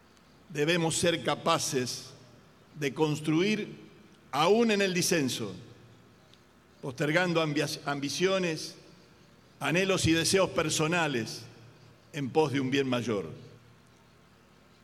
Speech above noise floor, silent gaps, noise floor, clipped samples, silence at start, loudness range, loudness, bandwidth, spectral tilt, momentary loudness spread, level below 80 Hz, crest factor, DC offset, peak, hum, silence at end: 31 dB; none; -59 dBFS; under 0.1%; 0.5 s; 3 LU; -28 LUFS; 15.5 kHz; -4 dB/octave; 16 LU; -62 dBFS; 20 dB; under 0.1%; -10 dBFS; none; 1.3 s